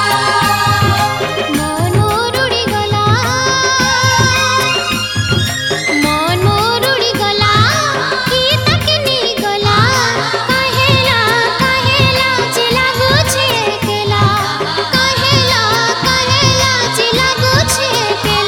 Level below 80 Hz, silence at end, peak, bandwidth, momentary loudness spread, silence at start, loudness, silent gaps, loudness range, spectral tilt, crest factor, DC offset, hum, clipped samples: -34 dBFS; 0 s; 0 dBFS; 17 kHz; 5 LU; 0 s; -11 LUFS; none; 2 LU; -3.5 dB/octave; 12 dB; under 0.1%; none; under 0.1%